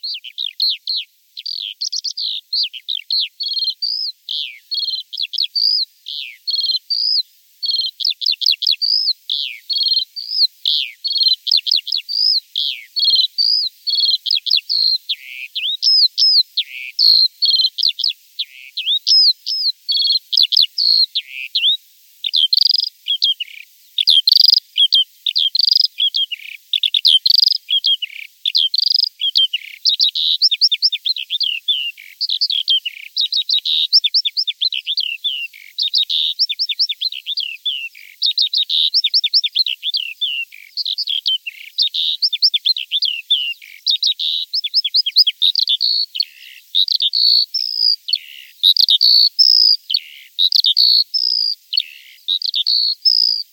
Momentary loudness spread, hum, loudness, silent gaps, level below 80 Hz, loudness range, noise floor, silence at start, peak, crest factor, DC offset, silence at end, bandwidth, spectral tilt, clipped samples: 12 LU; none; -14 LUFS; none; under -90 dBFS; 6 LU; -41 dBFS; 0.05 s; 0 dBFS; 18 dB; under 0.1%; 0.1 s; 17.5 kHz; 12 dB/octave; under 0.1%